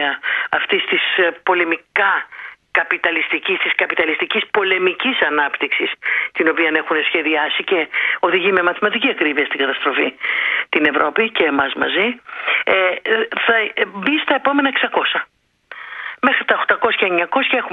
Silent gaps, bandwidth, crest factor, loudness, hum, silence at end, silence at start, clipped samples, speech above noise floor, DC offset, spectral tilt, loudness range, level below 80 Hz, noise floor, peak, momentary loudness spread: none; 5 kHz; 18 dB; -16 LUFS; none; 0 s; 0 s; under 0.1%; 21 dB; under 0.1%; -5.5 dB/octave; 1 LU; -64 dBFS; -39 dBFS; 0 dBFS; 4 LU